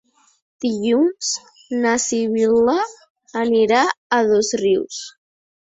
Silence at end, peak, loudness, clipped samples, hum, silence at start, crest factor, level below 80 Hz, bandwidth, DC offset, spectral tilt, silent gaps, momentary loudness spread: 0.7 s; -2 dBFS; -19 LUFS; under 0.1%; none; 0.6 s; 16 dB; -60 dBFS; 8.4 kHz; under 0.1%; -3 dB/octave; 3.10-3.15 s, 3.97-4.10 s; 12 LU